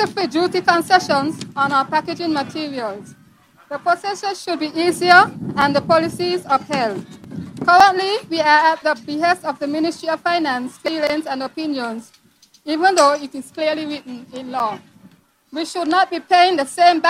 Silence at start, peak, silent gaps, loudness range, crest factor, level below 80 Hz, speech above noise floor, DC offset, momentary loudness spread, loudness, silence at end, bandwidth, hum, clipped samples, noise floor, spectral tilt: 0 s; 0 dBFS; none; 6 LU; 18 dB; -60 dBFS; 36 dB; under 0.1%; 15 LU; -18 LUFS; 0 s; 15.5 kHz; none; under 0.1%; -53 dBFS; -4 dB/octave